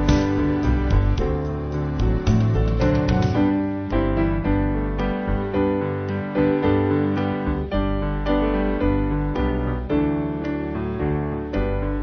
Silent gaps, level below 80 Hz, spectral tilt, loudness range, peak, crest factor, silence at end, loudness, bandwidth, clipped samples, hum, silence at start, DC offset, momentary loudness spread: none; -26 dBFS; -8.5 dB/octave; 2 LU; -4 dBFS; 16 dB; 0 s; -22 LUFS; 6.6 kHz; under 0.1%; none; 0 s; under 0.1%; 6 LU